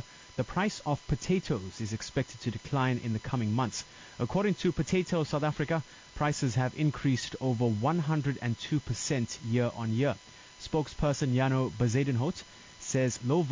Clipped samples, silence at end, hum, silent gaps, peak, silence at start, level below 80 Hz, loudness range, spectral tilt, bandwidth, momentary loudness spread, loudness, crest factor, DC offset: under 0.1%; 0 s; none; none; -16 dBFS; 0 s; -52 dBFS; 2 LU; -6 dB/octave; 7.6 kHz; 8 LU; -31 LUFS; 14 dB; under 0.1%